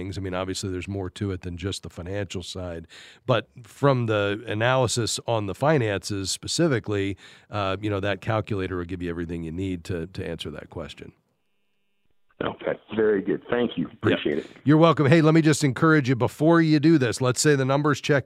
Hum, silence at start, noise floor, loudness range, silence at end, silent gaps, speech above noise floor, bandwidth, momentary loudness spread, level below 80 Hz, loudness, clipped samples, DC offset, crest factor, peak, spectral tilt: none; 0 s; -76 dBFS; 12 LU; 0.05 s; none; 53 dB; 15 kHz; 14 LU; -54 dBFS; -24 LUFS; under 0.1%; under 0.1%; 22 dB; -2 dBFS; -5.5 dB/octave